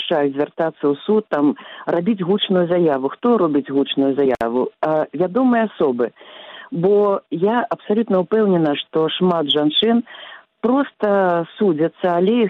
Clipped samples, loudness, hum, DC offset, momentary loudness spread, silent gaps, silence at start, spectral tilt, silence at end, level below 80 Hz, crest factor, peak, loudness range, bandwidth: under 0.1%; -18 LUFS; none; under 0.1%; 5 LU; none; 0 s; -8.5 dB/octave; 0 s; -62 dBFS; 12 dB; -6 dBFS; 1 LU; 5 kHz